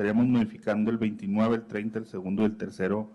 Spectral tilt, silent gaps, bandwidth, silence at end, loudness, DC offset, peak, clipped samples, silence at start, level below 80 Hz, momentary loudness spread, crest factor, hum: -8.5 dB/octave; none; 8.2 kHz; 0 s; -28 LUFS; under 0.1%; -16 dBFS; under 0.1%; 0 s; -62 dBFS; 9 LU; 12 dB; none